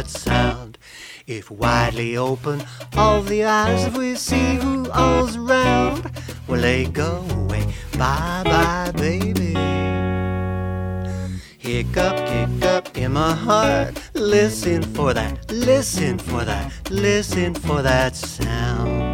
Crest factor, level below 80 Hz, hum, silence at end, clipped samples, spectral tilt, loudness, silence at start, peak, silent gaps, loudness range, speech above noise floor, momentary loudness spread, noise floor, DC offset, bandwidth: 18 dB; -32 dBFS; none; 0 s; under 0.1%; -5.5 dB/octave; -20 LUFS; 0 s; -2 dBFS; none; 3 LU; 21 dB; 9 LU; -41 dBFS; under 0.1%; 18 kHz